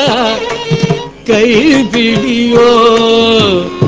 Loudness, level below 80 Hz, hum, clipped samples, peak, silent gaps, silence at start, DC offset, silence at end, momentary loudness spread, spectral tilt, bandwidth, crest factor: -9 LUFS; -38 dBFS; none; 0.8%; 0 dBFS; none; 0 s; under 0.1%; 0 s; 7 LU; -5 dB/octave; 8 kHz; 10 dB